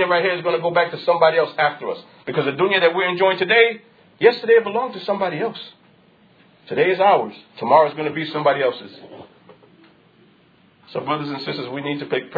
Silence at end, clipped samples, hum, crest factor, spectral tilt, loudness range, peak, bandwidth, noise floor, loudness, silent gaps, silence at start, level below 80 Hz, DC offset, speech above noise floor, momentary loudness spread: 0 s; under 0.1%; none; 20 dB; -7.5 dB/octave; 9 LU; -2 dBFS; 5 kHz; -55 dBFS; -19 LUFS; none; 0 s; -70 dBFS; under 0.1%; 36 dB; 15 LU